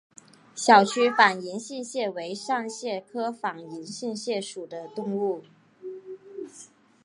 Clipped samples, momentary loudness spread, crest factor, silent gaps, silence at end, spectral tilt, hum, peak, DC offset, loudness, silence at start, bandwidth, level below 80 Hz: under 0.1%; 23 LU; 24 dB; none; 0.4 s; -3.5 dB/octave; none; -2 dBFS; under 0.1%; -25 LUFS; 0.55 s; 11.5 kHz; -84 dBFS